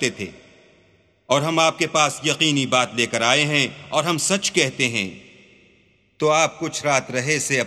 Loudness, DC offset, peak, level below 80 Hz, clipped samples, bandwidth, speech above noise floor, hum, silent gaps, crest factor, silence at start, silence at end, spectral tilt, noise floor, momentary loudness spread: -20 LUFS; under 0.1%; -2 dBFS; -64 dBFS; under 0.1%; 15 kHz; 38 dB; none; none; 20 dB; 0 s; 0 s; -3 dB/octave; -58 dBFS; 7 LU